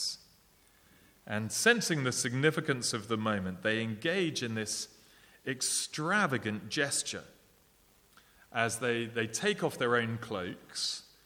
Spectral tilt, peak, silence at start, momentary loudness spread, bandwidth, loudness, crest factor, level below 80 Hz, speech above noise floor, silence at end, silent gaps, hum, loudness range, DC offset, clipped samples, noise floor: -3.5 dB/octave; -12 dBFS; 0 s; 10 LU; 19.5 kHz; -32 LUFS; 22 dB; -72 dBFS; 33 dB; 0.2 s; none; none; 3 LU; under 0.1%; under 0.1%; -65 dBFS